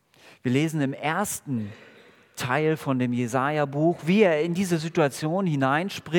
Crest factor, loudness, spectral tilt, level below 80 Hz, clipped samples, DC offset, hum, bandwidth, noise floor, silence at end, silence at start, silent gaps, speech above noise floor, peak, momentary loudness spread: 18 dB; -25 LUFS; -6 dB/octave; -70 dBFS; under 0.1%; under 0.1%; none; 18 kHz; -49 dBFS; 0 s; 0.45 s; none; 25 dB; -6 dBFS; 10 LU